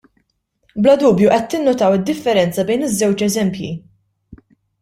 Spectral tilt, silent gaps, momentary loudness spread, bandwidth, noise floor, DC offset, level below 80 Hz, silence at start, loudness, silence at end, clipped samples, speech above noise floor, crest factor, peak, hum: -5.5 dB/octave; none; 13 LU; 16 kHz; -66 dBFS; under 0.1%; -52 dBFS; 0.75 s; -15 LUFS; 0.45 s; under 0.1%; 51 dB; 16 dB; -2 dBFS; none